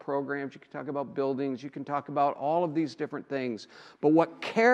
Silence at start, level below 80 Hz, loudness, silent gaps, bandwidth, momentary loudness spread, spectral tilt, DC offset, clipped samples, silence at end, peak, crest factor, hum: 0.05 s; -82 dBFS; -30 LUFS; none; 8.6 kHz; 13 LU; -6.5 dB/octave; under 0.1%; under 0.1%; 0 s; -10 dBFS; 20 dB; none